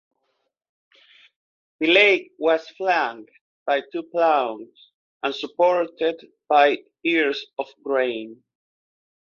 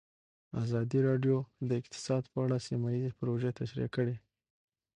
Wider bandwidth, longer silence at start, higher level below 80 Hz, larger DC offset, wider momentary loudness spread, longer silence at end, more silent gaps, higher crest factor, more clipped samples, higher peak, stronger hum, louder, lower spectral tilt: second, 7.2 kHz vs 10 kHz; first, 1.8 s vs 0.55 s; second, -74 dBFS vs -66 dBFS; neither; first, 15 LU vs 7 LU; first, 1.05 s vs 0.8 s; first, 3.41-3.66 s, 4.94-5.20 s vs none; about the same, 20 dB vs 16 dB; neither; first, -4 dBFS vs -18 dBFS; neither; first, -21 LUFS vs -34 LUFS; second, -4 dB/octave vs -7.5 dB/octave